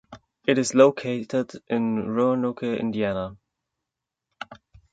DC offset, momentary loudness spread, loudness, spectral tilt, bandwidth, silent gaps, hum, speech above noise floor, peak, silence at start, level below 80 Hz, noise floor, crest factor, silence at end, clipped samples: under 0.1%; 20 LU; -24 LUFS; -5.5 dB/octave; 9.2 kHz; none; none; 63 dB; -4 dBFS; 0.1 s; -60 dBFS; -86 dBFS; 22 dB; 0.4 s; under 0.1%